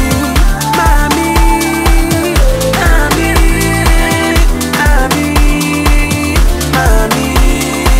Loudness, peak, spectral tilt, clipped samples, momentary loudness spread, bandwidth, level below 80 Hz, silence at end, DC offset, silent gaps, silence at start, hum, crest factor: -11 LUFS; 0 dBFS; -4.5 dB/octave; under 0.1%; 2 LU; 16.5 kHz; -12 dBFS; 0 s; under 0.1%; none; 0 s; none; 8 dB